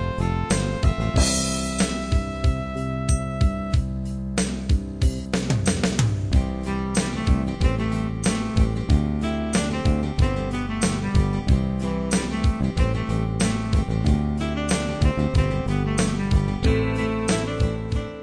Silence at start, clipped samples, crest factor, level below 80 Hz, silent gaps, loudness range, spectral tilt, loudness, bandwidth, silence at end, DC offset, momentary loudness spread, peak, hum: 0 s; under 0.1%; 16 dB; -26 dBFS; none; 2 LU; -5.5 dB/octave; -23 LUFS; 11 kHz; 0 s; 0.2%; 4 LU; -6 dBFS; none